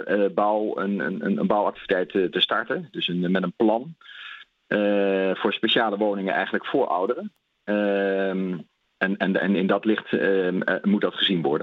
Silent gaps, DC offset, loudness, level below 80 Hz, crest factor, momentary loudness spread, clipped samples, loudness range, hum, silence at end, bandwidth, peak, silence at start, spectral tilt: none; under 0.1%; -23 LUFS; -70 dBFS; 18 dB; 8 LU; under 0.1%; 1 LU; none; 0 s; 5.4 kHz; -6 dBFS; 0 s; -8 dB/octave